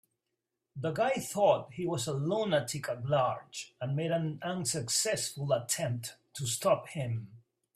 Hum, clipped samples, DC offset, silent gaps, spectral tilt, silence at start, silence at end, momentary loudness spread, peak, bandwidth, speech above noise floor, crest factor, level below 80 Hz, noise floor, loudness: none; under 0.1%; under 0.1%; none; -4 dB/octave; 0.75 s; 0.35 s; 10 LU; -14 dBFS; 15.5 kHz; 54 dB; 18 dB; -70 dBFS; -86 dBFS; -32 LUFS